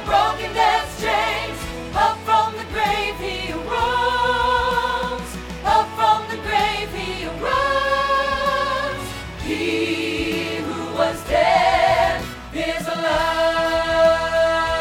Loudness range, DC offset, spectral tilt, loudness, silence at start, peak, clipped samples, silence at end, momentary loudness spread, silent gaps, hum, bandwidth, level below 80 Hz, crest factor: 3 LU; under 0.1%; -4 dB/octave; -20 LUFS; 0 s; -4 dBFS; under 0.1%; 0 s; 9 LU; none; none; 18 kHz; -38 dBFS; 16 dB